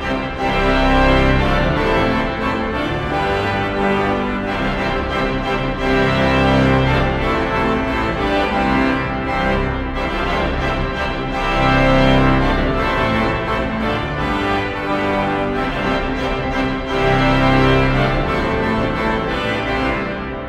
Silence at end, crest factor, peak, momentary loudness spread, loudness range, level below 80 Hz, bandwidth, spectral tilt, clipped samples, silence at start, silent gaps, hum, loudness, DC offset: 0 s; 16 dB; 0 dBFS; 6 LU; 3 LU; -26 dBFS; 12.5 kHz; -6.5 dB/octave; under 0.1%; 0 s; none; none; -17 LUFS; under 0.1%